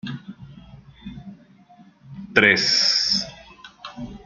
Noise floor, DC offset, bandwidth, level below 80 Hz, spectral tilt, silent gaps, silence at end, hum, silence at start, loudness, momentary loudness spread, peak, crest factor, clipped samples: -51 dBFS; under 0.1%; 11.5 kHz; -54 dBFS; -2 dB/octave; none; 0.1 s; none; 0.05 s; -17 LUFS; 26 LU; -2 dBFS; 24 dB; under 0.1%